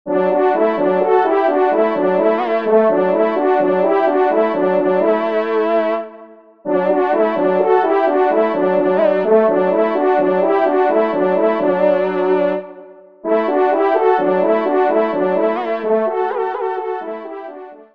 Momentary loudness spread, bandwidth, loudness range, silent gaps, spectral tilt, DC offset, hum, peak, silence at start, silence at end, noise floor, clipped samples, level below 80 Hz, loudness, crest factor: 7 LU; 5.2 kHz; 2 LU; none; -8.5 dB/octave; 0.4%; none; -2 dBFS; 0.05 s; 0.1 s; -41 dBFS; under 0.1%; -66 dBFS; -16 LUFS; 14 dB